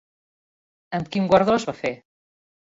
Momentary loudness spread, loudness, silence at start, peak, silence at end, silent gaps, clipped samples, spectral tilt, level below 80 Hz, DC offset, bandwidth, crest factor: 13 LU; -22 LUFS; 0.9 s; -4 dBFS; 0.85 s; none; under 0.1%; -6 dB/octave; -56 dBFS; under 0.1%; 7.8 kHz; 22 dB